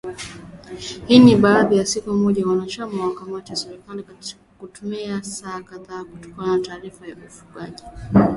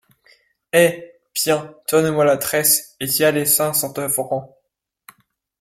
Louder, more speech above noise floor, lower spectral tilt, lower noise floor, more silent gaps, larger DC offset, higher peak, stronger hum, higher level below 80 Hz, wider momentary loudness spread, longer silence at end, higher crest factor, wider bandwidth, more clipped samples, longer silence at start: about the same, -18 LUFS vs -18 LUFS; second, 18 dB vs 55 dB; first, -5.5 dB/octave vs -3 dB/octave; second, -37 dBFS vs -73 dBFS; neither; neither; about the same, 0 dBFS vs 0 dBFS; neither; first, -48 dBFS vs -60 dBFS; first, 23 LU vs 7 LU; second, 0 s vs 1.15 s; about the same, 20 dB vs 20 dB; second, 11.5 kHz vs 16.5 kHz; neither; second, 0.05 s vs 0.75 s